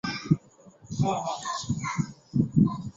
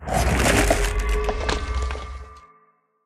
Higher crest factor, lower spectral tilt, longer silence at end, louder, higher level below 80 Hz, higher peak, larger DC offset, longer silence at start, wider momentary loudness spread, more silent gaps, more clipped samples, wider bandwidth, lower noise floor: about the same, 20 dB vs 18 dB; first, -6 dB/octave vs -4 dB/octave; second, 0.05 s vs 0.65 s; second, -28 LUFS vs -22 LUFS; second, -54 dBFS vs -26 dBFS; about the same, -8 dBFS vs -6 dBFS; neither; about the same, 0.05 s vs 0 s; second, 8 LU vs 15 LU; neither; neither; second, 8 kHz vs 15 kHz; second, -54 dBFS vs -61 dBFS